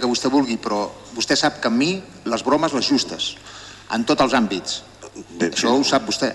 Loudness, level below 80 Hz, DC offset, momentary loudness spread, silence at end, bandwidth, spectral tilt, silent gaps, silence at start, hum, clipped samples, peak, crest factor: -20 LUFS; -54 dBFS; under 0.1%; 12 LU; 0 s; 11.5 kHz; -3.5 dB/octave; none; 0 s; none; under 0.1%; -6 dBFS; 16 dB